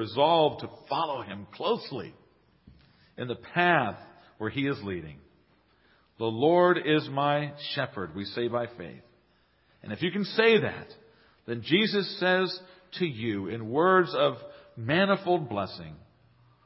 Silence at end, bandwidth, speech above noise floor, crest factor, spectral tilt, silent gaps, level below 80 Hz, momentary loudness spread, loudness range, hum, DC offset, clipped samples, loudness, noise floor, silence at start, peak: 0.7 s; 5.8 kHz; 39 dB; 20 dB; -9.5 dB/octave; none; -64 dBFS; 18 LU; 4 LU; none; under 0.1%; under 0.1%; -27 LUFS; -66 dBFS; 0 s; -8 dBFS